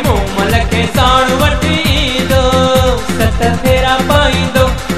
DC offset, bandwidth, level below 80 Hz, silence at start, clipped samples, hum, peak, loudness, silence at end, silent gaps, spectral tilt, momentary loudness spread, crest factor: 4%; 14.5 kHz; -20 dBFS; 0 s; under 0.1%; none; 0 dBFS; -11 LUFS; 0 s; none; -5 dB/octave; 4 LU; 12 dB